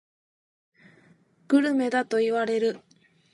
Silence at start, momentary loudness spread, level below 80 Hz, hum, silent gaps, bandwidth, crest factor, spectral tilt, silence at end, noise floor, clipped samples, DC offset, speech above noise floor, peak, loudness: 1.5 s; 6 LU; -82 dBFS; none; none; 11.5 kHz; 18 dB; -5 dB/octave; 0.55 s; -60 dBFS; under 0.1%; under 0.1%; 36 dB; -10 dBFS; -25 LUFS